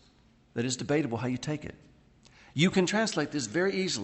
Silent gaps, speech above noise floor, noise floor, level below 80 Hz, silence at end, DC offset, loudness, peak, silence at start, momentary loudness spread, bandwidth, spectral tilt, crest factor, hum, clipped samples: none; 33 dB; -62 dBFS; -64 dBFS; 0 s; under 0.1%; -30 LUFS; -10 dBFS; 0.55 s; 12 LU; 8.4 kHz; -4.5 dB/octave; 20 dB; none; under 0.1%